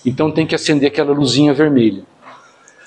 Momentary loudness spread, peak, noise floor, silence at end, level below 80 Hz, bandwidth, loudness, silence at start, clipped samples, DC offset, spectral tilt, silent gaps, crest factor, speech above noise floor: 5 LU; 0 dBFS; -45 dBFS; 0.5 s; -54 dBFS; 9.6 kHz; -14 LUFS; 0.05 s; under 0.1%; under 0.1%; -5.5 dB/octave; none; 14 dB; 31 dB